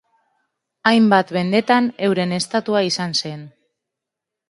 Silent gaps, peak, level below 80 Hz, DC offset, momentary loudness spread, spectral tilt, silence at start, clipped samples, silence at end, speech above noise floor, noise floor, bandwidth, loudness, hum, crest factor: none; 0 dBFS; -66 dBFS; under 0.1%; 8 LU; -5 dB/octave; 0.85 s; under 0.1%; 1 s; 66 dB; -84 dBFS; 11.5 kHz; -18 LUFS; none; 20 dB